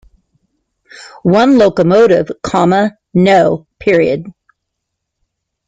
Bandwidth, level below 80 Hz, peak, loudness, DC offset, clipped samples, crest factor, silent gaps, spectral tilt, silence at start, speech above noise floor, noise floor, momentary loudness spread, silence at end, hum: 9.2 kHz; -48 dBFS; 0 dBFS; -11 LUFS; under 0.1%; under 0.1%; 12 dB; none; -7 dB/octave; 1 s; 64 dB; -74 dBFS; 8 LU; 1.35 s; none